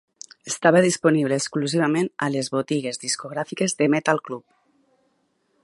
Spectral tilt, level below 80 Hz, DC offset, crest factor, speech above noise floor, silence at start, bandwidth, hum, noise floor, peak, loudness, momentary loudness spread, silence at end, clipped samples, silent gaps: -4.5 dB/octave; -72 dBFS; under 0.1%; 22 dB; 47 dB; 0.45 s; 11.5 kHz; none; -68 dBFS; -2 dBFS; -22 LUFS; 13 LU; 1.25 s; under 0.1%; none